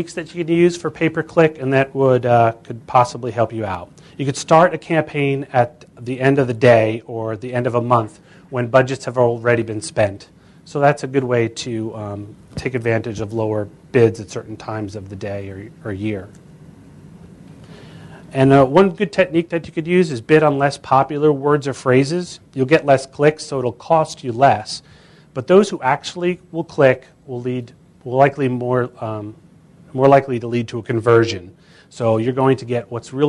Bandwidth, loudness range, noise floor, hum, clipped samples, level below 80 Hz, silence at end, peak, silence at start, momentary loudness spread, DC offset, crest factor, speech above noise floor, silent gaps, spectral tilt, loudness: 11.5 kHz; 5 LU; -47 dBFS; none; under 0.1%; -54 dBFS; 0 s; 0 dBFS; 0 s; 15 LU; under 0.1%; 18 dB; 29 dB; none; -6.5 dB/octave; -18 LUFS